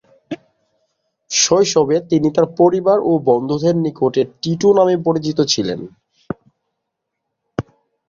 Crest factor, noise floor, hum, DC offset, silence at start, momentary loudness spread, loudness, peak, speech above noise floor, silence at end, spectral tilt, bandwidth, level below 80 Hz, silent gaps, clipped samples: 16 dB; -77 dBFS; none; under 0.1%; 0.3 s; 18 LU; -15 LUFS; 0 dBFS; 62 dB; 0.5 s; -4.5 dB/octave; 7.6 kHz; -54 dBFS; none; under 0.1%